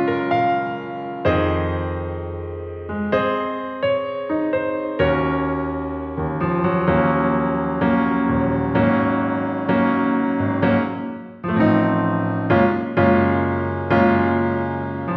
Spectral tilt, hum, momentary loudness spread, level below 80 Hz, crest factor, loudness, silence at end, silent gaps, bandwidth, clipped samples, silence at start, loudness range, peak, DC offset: -10 dB/octave; none; 10 LU; -42 dBFS; 16 dB; -20 LUFS; 0 s; none; 5.8 kHz; under 0.1%; 0 s; 4 LU; -4 dBFS; under 0.1%